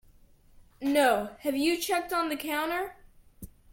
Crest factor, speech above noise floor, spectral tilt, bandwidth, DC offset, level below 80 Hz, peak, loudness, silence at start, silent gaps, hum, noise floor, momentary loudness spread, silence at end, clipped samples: 20 dB; 30 dB; -3 dB/octave; 17 kHz; under 0.1%; -58 dBFS; -10 dBFS; -28 LUFS; 0.8 s; none; none; -58 dBFS; 9 LU; 0.2 s; under 0.1%